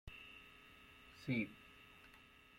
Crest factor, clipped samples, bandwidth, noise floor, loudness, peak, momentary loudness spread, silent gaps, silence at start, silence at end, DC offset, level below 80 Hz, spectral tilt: 20 dB; under 0.1%; 16.5 kHz; -65 dBFS; -46 LUFS; -28 dBFS; 19 LU; none; 0.05 s; 0 s; under 0.1%; -68 dBFS; -6.5 dB/octave